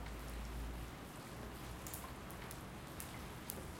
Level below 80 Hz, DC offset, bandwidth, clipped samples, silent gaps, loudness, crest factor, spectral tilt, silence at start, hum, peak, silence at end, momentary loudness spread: -52 dBFS; under 0.1%; 16.5 kHz; under 0.1%; none; -49 LUFS; 32 dB; -4.5 dB/octave; 0 s; none; -16 dBFS; 0 s; 3 LU